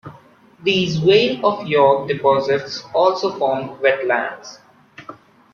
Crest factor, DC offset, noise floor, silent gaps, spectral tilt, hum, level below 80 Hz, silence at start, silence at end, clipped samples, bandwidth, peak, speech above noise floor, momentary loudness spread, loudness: 16 dB; under 0.1%; -48 dBFS; none; -5.5 dB/octave; none; -60 dBFS; 0.05 s; 0.4 s; under 0.1%; 7 kHz; -2 dBFS; 30 dB; 12 LU; -18 LUFS